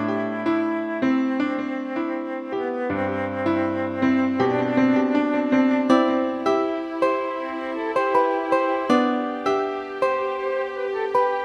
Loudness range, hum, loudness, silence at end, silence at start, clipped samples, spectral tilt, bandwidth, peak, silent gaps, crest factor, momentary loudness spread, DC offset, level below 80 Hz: 4 LU; none; -23 LUFS; 0 s; 0 s; under 0.1%; -6.5 dB/octave; 10 kHz; -4 dBFS; none; 18 dB; 8 LU; under 0.1%; -64 dBFS